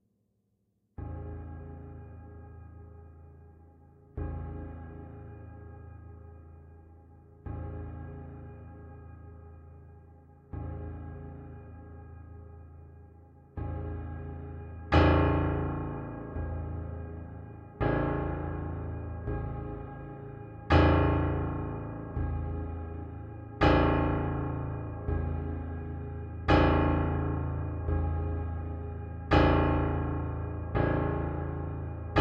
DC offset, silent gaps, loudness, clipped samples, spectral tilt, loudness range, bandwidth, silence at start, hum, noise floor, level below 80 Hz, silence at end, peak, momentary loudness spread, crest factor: under 0.1%; none; -31 LUFS; under 0.1%; -9 dB/octave; 16 LU; 6.2 kHz; 1 s; none; -75 dBFS; -40 dBFS; 0 s; -10 dBFS; 24 LU; 22 dB